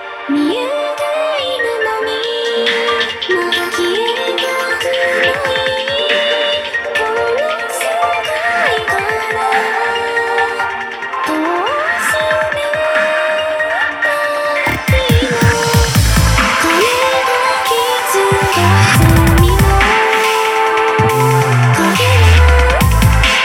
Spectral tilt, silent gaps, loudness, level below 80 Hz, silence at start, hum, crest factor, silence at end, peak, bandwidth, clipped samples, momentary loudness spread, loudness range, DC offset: -4.5 dB/octave; none; -13 LUFS; -22 dBFS; 0 s; none; 12 dB; 0 s; 0 dBFS; over 20 kHz; under 0.1%; 6 LU; 4 LU; under 0.1%